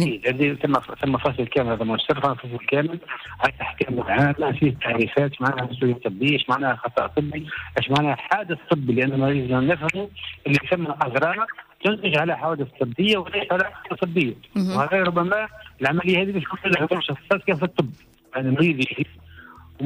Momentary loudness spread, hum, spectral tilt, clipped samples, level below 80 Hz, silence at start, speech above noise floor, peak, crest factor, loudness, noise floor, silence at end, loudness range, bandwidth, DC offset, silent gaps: 7 LU; none; -7 dB/octave; under 0.1%; -54 dBFS; 0 s; 22 dB; -8 dBFS; 16 dB; -23 LUFS; -45 dBFS; 0 s; 1 LU; 15.5 kHz; under 0.1%; none